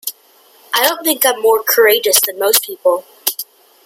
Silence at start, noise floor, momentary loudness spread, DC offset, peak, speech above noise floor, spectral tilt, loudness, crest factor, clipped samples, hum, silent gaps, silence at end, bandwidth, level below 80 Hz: 0.05 s; -49 dBFS; 9 LU; under 0.1%; 0 dBFS; 35 dB; 1 dB/octave; -13 LUFS; 16 dB; under 0.1%; none; none; 0.4 s; 17 kHz; -68 dBFS